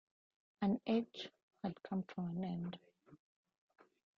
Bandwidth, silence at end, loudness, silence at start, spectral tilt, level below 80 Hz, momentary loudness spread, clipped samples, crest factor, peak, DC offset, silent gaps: 7 kHz; 1 s; -42 LUFS; 0.6 s; -8 dB/octave; -78 dBFS; 12 LU; under 0.1%; 18 dB; -24 dBFS; under 0.1%; 1.43-1.48 s